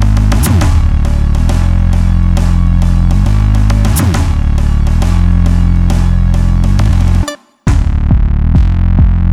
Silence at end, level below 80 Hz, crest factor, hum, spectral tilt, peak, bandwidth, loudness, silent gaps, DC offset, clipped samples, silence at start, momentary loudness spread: 0 s; -10 dBFS; 8 dB; none; -7 dB/octave; 0 dBFS; 15 kHz; -11 LUFS; none; under 0.1%; under 0.1%; 0 s; 3 LU